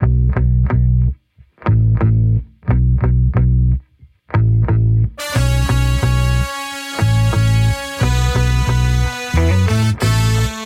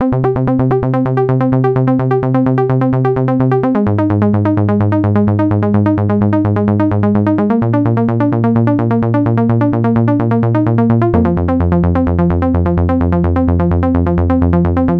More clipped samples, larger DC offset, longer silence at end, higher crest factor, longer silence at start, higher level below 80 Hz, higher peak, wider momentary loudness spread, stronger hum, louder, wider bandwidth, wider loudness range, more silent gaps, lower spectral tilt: neither; neither; about the same, 0 s vs 0 s; about the same, 12 dB vs 12 dB; about the same, 0 s vs 0 s; first, -20 dBFS vs -30 dBFS; about the same, -2 dBFS vs 0 dBFS; first, 5 LU vs 1 LU; neither; second, -16 LUFS vs -13 LUFS; first, 15.5 kHz vs 4.6 kHz; about the same, 1 LU vs 0 LU; neither; second, -6 dB/octave vs -11.5 dB/octave